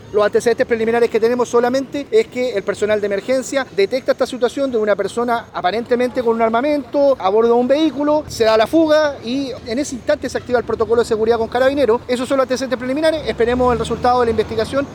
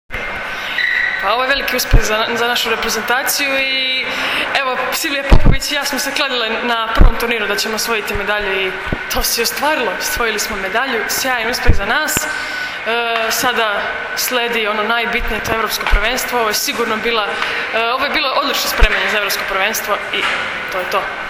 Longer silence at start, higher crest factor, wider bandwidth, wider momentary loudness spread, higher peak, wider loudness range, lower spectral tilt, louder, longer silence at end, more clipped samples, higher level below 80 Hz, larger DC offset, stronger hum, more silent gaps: about the same, 0 s vs 0.1 s; about the same, 12 dB vs 16 dB; about the same, 18 kHz vs 17 kHz; about the same, 6 LU vs 4 LU; second, -4 dBFS vs 0 dBFS; about the same, 3 LU vs 2 LU; first, -5 dB/octave vs -2.5 dB/octave; about the same, -17 LUFS vs -16 LUFS; about the same, 0 s vs 0 s; second, under 0.1% vs 0.1%; second, -44 dBFS vs -22 dBFS; neither; neither; neither